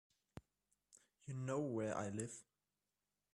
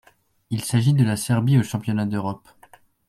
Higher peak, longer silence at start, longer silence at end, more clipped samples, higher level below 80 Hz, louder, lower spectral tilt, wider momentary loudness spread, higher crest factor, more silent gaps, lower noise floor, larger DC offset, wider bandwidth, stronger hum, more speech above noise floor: second, -28 dBFS vs -6 dBFS; second, 0.35 s vs 0.5 s; first, 0.9 s vs 0.7 s; neither; second, -78 dBFS vs -58 dBFS; second, -44 LUFS vs -22 LUFS; about the same, -6 dB/octave vs -6.5 dB/octave; first, 20 LU vs 11 LU; about the same, 20 dB vs 16 dB; neither; first, under -90 dBFS vs -53 dBFS; neither; second, 12 kHz vs 15 kHz; neither; first, over 47 dB vs 33 dB